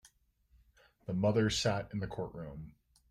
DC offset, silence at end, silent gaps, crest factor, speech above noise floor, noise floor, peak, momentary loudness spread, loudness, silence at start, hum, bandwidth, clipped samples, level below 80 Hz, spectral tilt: under 0.1%; 0.4 s; none; 18 dB; 36 dB; -70 dBFS; -18 dBFS; 20 LU; -34 LUFS; 1.1 s; none; 13.5 kHz; under 0.1%; -58 dBFS; -5 dB/octave